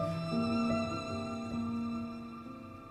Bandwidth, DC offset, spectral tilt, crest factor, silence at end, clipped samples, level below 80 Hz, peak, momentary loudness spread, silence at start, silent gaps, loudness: 10.5 kHz; under 0.1%; -6.5 dB/octave; 16 dB; 0 s; under 0.1%; -60 dBFS; -20 dBFS; 14 LU; 0 s; none; -36 LUFS